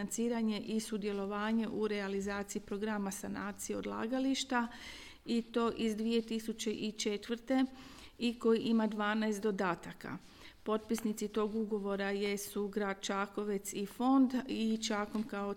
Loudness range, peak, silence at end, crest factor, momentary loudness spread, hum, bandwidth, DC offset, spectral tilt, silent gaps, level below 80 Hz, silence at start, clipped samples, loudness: 3 LU; -20 dBFS; 0 s; 16 dB; 8 LU; none; 17 kHz; under 0.1%; -4.5 dB/octave; none; -64 dBFS; 0 s; under 0.1%; -36 LUFS